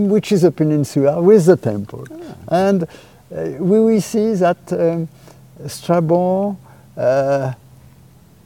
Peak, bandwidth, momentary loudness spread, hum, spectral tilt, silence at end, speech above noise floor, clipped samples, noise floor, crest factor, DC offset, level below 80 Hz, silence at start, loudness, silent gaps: 0 dBFS; 17 kHz; 20 LU; none; -7.5 dB/octave; 0.9 s; 31 dB; under 0.1%; -46 dBFS; 16 dB; 0.1%; -56 dBFS; 0 s; -16 LUFS; none